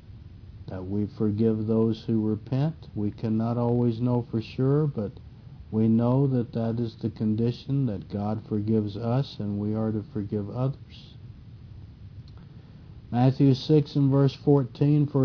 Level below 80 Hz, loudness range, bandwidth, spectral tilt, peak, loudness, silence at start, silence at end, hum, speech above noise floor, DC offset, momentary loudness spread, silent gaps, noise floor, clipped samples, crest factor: -54 dBFS; 7 LU; 5.4 kHz; -10 dB/octave; -8 dBFS; -26 LUFS; 0.1 s; 0 s; none; 21 dB; under 0.1%; 23 LU; none; -46 dBFS; under 0.1%; 18 dB